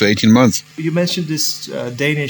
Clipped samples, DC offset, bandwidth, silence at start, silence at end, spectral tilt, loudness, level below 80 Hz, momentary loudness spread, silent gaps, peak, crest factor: under 0.1%; under 0.1%; over 20 kHz; 0 s; 0 s; -4.5 dB/octave; -16 LUFS; -54 dBFS; 10 LU; none; 0 dBFS; 16 dB